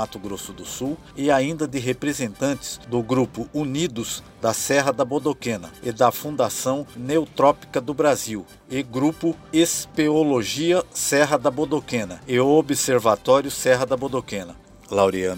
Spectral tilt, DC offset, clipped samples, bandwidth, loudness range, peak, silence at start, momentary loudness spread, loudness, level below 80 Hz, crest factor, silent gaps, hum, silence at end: -4.5 dB/octave; under 0.1%; under 0.1%; 16 kHz; 4 LU; -4 dBFS; 0 s; 11 LU; -22 LUFS; -54 dBFS; 18 dB; none; none; 0 s